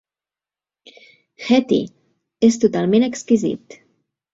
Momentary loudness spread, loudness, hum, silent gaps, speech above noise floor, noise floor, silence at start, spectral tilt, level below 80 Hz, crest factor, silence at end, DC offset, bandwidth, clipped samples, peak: 15 LU; -18 LUFS; none; none; over 73 dB; under -90 dBFS; 1.4 s; -5.5 dB/octave; -60 dBFS; 18 dB; 0.75 s; under 0.1%; 7.8 kHz; under 0.1%; -2 dBFS